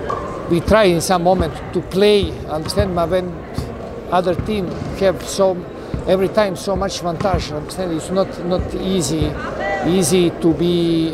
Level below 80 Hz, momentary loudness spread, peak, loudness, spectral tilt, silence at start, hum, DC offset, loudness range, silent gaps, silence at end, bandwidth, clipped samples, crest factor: -34 dBFS; 10 LU; 0 dBFS; -18 LUFS; -5.5 dB/octave; 0 s; none; under 0.1%; 4 LU; none; 0 s; 16 kHz; under 0.1%; 16 dB